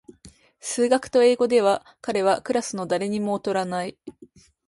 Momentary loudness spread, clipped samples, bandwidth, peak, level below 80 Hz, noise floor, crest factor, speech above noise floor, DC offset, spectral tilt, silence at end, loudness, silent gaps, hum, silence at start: 11 LU; under 0.1%; 11.5 kHz; -8 dBFS; -64 dBFS; -52 dBFS; 16 dB; 29 dB; under 0.1%; -4.5 dB/octave; 0.4 s; -23 LUFS; none; none; 0.25 s